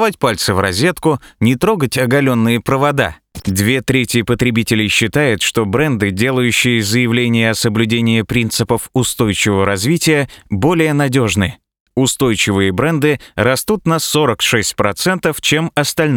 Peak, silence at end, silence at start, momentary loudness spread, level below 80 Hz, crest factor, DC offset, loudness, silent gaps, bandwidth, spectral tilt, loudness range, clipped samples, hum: 0 dBFS; 0 s; 0 s; 3 LU; -42 dBFS; 14 dB; under 0.1%; -14 LUFS; 11.80-11.86 s; over 20 kHz; -4.5 dB/octave; 1 LU; under 0.1%; none